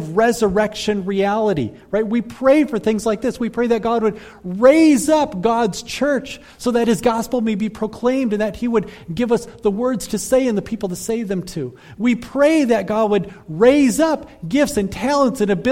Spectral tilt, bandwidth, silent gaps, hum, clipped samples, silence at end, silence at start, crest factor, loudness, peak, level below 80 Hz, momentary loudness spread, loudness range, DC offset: -5.5 dB/octave; 16.5 kHz; none; none; under 0.1%; 0 s; 0 s; 16 dB; -18 LUFS; 0 dBFS; -46 dBFS; 9 LU; 4 LU; under 0.1%